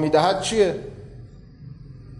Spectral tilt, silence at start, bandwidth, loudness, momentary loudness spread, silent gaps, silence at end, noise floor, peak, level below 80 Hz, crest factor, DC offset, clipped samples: -4.5 dB/octave; 0 s; 11.5 kHz; -21 LUFS; 24 LU; none; 0 s; -42 dBFS; -6 dBFS; -48 dBFS; 18 dB; under 0.1%; under 0.1%